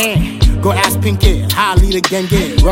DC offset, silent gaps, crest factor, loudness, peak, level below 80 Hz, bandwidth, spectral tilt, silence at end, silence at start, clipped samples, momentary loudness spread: under 0.1%; none; 12 dB; -13 LUFS; 0 dBFS; -16 dBFS; 17 kHz; -5 dB/octave; 0 s; 0 s; under 0.1%; 2 LU